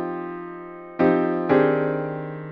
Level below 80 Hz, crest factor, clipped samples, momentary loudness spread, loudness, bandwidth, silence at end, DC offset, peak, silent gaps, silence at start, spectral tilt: -62 dBFS; 18 dB; under 0.1%; 17 LU; -22 LUFS; 5.2 kHz; 0 s; under 0.1%; -6 dBFS; none; 0 s; -10 dB/octave